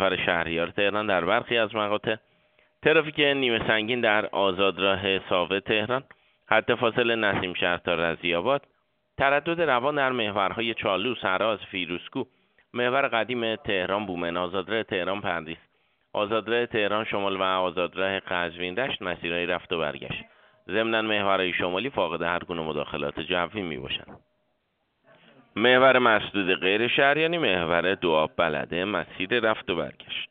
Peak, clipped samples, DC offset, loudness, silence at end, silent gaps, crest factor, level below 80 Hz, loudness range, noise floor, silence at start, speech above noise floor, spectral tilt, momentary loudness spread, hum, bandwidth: -4 dBFS; under 0.1%; under 0.1%; -25 LUFS; 0.05 s; none; 22 dB; -58 dBFS; 6 LU; -74 dBFS; 0 s; 49 dB; -2 dB/octave; 9 LU; none; 4.7 kHz